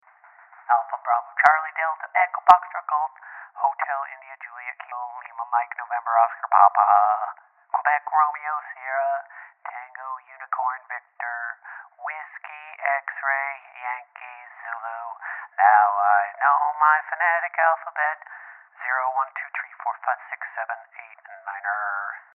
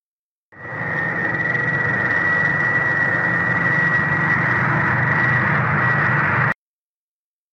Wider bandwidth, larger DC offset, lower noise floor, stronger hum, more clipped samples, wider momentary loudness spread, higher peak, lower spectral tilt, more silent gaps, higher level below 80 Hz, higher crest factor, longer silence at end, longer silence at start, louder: second, 4.6 kHz vs 7.8 kHz; neither; second, -53 dBFS vs under -90 dBFS; neither; neither; first, 20 LU vs 5 LU; first, 0 dBFS vs -4 dBFS; second, 3 dB/octave vs -7.5 dB/octave; neither; second, -82 dBFS vs -52 dBFS; first, 24 dB vs 14 dB; second, 0.15 s vs 1 s; first, 0.7 s vs 0.55 s; second, -23 LUFS vs -17 LUFS